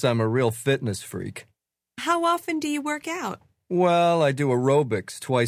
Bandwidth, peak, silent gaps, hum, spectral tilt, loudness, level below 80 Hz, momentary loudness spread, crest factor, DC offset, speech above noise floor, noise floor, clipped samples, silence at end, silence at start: 16 kHz; -8 dBFS; none; none; -5.5 dB/octave; -24 LUFS; -60 dBFS; 14 LU; 16 dB; under 0.1%; 22 dB; -45 dBFS; under 0.1%; 0 s; 0 s